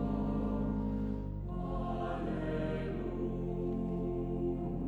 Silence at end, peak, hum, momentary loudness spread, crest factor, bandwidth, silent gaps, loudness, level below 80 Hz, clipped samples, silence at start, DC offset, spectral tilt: 0 s; -22 dBFS; none; 4 LU; 12 dB; 4.7 kHz; none; -37 LUFS; -42 dBFS; under 0.1%; 0 s; under 0.1%; -10 dB/octave